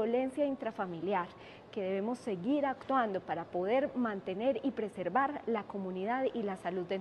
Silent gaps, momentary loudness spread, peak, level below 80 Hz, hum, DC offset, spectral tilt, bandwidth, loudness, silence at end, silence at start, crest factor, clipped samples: none; 6 LU; -18 dBFS; -72 dBFS; none; under 0.1%; -7 dB/octave; 11.5 kHz; -35 LUFS; 0 s; 0 s; 18 dB; under 0.1%